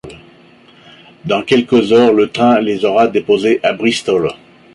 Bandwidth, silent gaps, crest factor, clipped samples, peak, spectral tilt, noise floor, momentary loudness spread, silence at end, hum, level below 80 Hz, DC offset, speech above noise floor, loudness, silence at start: 11.5 kHz; none; 12 dB; under 0.1%; -2 dBFS; -5.5 dB/octave; -44 dBFS; 8 LU; 0.4 s; none; -52 dBFS; under 0.1%; 32 dB; -13 LUFS; 0.05 s